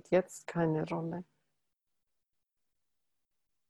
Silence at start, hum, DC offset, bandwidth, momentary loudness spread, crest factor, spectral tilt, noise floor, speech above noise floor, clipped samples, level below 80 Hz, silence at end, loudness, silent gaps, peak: 0.1 s; none; under 0.1%; 12.5 kHz; 9 LU; 22 dB; -7 dB/octave; -87 dBFS; 54 dB; under 0.1%; -72 dBFS; 2.45 s; -34 LUFS; none; -16 dBFS